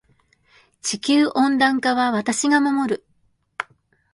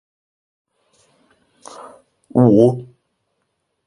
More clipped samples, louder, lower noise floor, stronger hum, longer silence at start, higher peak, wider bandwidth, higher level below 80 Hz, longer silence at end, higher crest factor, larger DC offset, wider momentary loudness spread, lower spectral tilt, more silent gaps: neither; second, -20 LUFS vs -14 LUFS; second, -64 dBFS vs -72 dBFS; neither; second, 0.85 s vs 2.35 s; second, -4 dBFS vs 0 dBFS; about the same, 11.5 kHz vs 11 kHz; second, -66 dBFS vs -58 dBFS; second, 0.5 s vs 1.05 s; about the same, 18 dB vs 20 dB; neither; second, 15 LU vs 26 LU; second, -3 dB/octave vs -9.5 dB/octave; neither